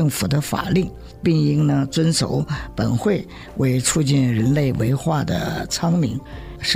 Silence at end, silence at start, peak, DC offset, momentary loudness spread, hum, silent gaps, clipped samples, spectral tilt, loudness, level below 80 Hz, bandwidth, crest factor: 0 s; 0 s; -6 dBFS; under 0.1%; 7 LU; none; none; under 0.1%; -5.5 dB/octave; -20 LUFS; -40 dBFS; 16 kHz; 14 dB